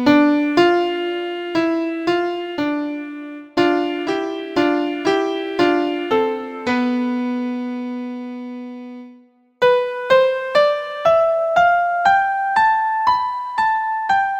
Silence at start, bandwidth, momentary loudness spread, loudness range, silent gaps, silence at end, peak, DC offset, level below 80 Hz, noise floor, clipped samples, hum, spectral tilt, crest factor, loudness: 0 s; 16.5 kHz; 12 LU; 6 LU; none; 0 s; -2 dBFS; under 0.1%; -58 dBFS; -49 dBFS; under 0.1%; none; -5 dB/octave; 16 dB; -18 LUFS